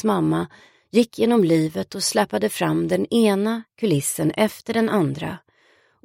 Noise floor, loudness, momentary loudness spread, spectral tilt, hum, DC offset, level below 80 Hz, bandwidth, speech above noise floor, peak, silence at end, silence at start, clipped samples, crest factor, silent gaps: -59 dBFS; -21 LUFS; 7 LU; -5 dB/octave; none; under 0.1%; -60 dBFS; 16.5 kHz; 39 dB; -4 dBFS; 0.65 s; 0.05 s; under 0.1%; 18 dB; none